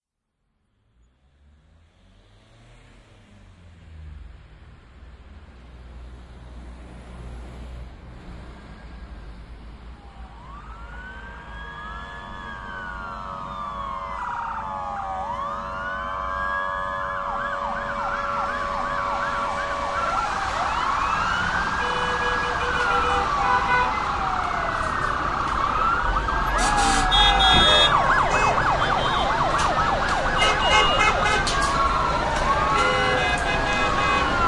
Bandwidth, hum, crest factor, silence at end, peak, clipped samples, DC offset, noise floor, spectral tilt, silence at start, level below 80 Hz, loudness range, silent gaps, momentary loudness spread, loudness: 12 kHz; none; 20 dB; 0 s; -4 dBFS; under 0.1%; under 0.1%; -77 dBFS; -3 dB/octave; 3.45 s; -36 dBFS; 24 LU; none; 24 LU; -22 LUFS